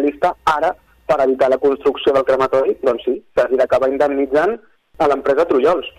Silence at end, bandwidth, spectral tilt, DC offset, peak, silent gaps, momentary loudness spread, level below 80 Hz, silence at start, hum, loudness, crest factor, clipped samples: 0.1 s; 12.5 kHz; -5.5 dB/octave; under 0.1%; -4 dBFS; none; 5 LU; -48 dBFS; 0 s; none; -16 LUFS; 14 dB; under 0.1%